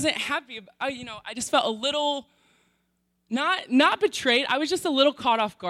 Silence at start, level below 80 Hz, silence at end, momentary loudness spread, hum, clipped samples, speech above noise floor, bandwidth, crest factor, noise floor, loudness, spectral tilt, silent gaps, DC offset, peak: 0 s; -66 dBFS; 0 s; 11 LU; none; under 0.1%; 48 dB; 15.5 kHz; 18 dB; -73 dBFS; -24 LUFS; -2.5 dB/octave; none; under 0.1%; -6 dBFS